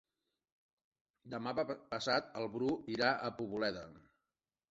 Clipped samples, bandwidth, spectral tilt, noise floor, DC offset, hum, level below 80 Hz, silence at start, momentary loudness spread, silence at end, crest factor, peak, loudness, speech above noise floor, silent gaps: under 0.1%; 8 kHz; -2.5 dB/octave; under -90 dBFS; under 0.1%; none; -72 dBFS; 1.25 s; 10 LU; 0.7 s; 24 dB; -16 dBFS; -38 LUFS; over 52 dB; none